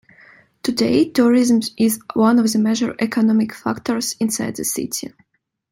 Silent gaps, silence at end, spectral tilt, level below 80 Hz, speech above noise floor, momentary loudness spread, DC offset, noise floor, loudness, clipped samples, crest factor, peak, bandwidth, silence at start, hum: none; 0.65 s; -4.5 dB/octave; -58 dBFS; 32 dB; 9 LU; under 0.1%; -49 dBFS; -18 LUFS; under 0.1%; 16 dB; -2 dBFS; 16.5 kHz; 0.65 s; none